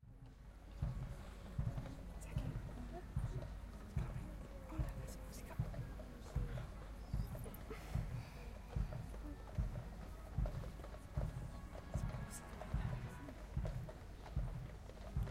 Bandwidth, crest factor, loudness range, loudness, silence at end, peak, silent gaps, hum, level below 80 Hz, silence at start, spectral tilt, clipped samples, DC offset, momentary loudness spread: 16 kHz; 18 dB; 1 LU; -48 LUFS; 0 s; -28 dBFS; none; none; -48 dBFS; 0 s; -7 dB/octave; under 0.1%; under 0.1%; 8 LU